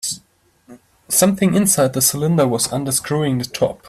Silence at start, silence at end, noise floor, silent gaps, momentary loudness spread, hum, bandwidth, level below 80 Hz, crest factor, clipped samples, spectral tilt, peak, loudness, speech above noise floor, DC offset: 0.05 s; 0 s; -57 dBFS; none; 7 LU; none; 16 kHz; -52 dBFS; 18 dB; under 0.1%; -4 dB/octave; 0 dBFS; -17 LUFS; 40 dB; under 0.1%